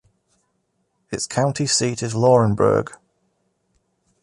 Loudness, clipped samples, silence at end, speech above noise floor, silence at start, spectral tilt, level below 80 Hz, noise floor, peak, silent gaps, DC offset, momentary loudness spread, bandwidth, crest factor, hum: -19 LUFS; under 0.1%; 1.25 s; 52 dB; 1.1 s; -5 dB/octave; -52 dBFS; -70 dBFS; -4 dBFS; none; under 0.1%; 12 LU; 11.5 kHz; 18 dB; none